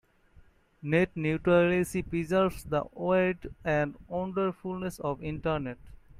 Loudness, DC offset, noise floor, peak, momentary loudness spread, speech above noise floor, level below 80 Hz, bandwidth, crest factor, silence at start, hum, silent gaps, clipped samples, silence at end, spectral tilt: -29 LUFS; under 0.1%; -59 dBFS; -12 dBFS; 11 LU; 30 dB; -52 dBFS; 15.5 kHz; 18 dB; 0.85 s; none; none; under 0.1%; 0 s; -7 dB/octave